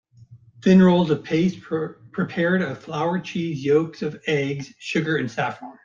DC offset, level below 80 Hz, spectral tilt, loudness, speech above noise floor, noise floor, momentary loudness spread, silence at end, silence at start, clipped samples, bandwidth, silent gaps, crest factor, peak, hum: under 0.1%; -60 dBFS; -7 dB/octave; -22 LUFS; 28 dB; -49 dBFS; 12 LU; 0.15 s; 0.2 s; under 0.1%; 7.2 kHz; none; 18 dB; -4 dBFS; none